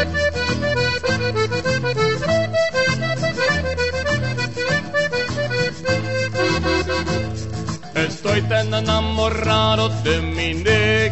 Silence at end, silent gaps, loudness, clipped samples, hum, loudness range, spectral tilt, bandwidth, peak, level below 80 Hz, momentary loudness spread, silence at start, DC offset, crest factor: 0 s; none; -20 LUFS; under 0.1%; none; 2 LU; -5 dB/octave; 8.4 kHz; -4 dBFS; -36 dBFS; 5 LU; 0 s; 1%; 16 dB